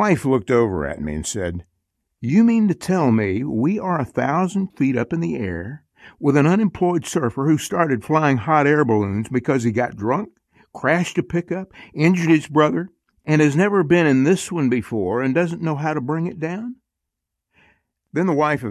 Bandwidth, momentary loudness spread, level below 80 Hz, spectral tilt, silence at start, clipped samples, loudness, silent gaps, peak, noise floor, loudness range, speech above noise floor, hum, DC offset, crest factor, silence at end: 13.5 kHz; 11 LU; -46 dBFS; -6.5 dB/octave; 0 s; under 0.1%; -20 LUFS; none; -2 dBFS; -81 dBFS; 4 LU; 62 dB; none; under 0.1%; 16 dB; 0 s